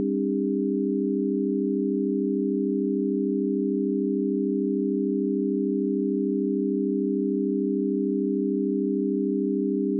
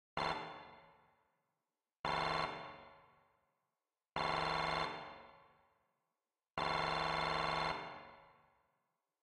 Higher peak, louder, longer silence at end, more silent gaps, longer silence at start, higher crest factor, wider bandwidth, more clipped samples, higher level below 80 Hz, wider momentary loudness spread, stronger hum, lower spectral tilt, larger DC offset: first, -16 dBFS vs -20 dBFS; first, -25 LUFS vs -39 LUFS; second, 0 s vs 0.95 s; second, none vs 1.99-2.04 s; second, 0 s vs 0.15 s; second, 8 dB vs 22 dB; second, 0.5 kHz vs 13.5 kHz; neither; second, under -90 dBFS vs -64 dBFS; second, 0 LU vs 18 LU; neither; first, -17.5 dB/octave vs -4 dB/octave; neither